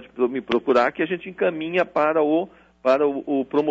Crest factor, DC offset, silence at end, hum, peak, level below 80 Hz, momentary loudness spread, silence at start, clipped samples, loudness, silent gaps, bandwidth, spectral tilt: 14 dB; under 0.1%; 0 s; none; -8 dBFS; -62 dBFS; 6 LU; 0 s; under 0.1%; -22 LUFS; none; 7.8 kHz; -7 dB/octave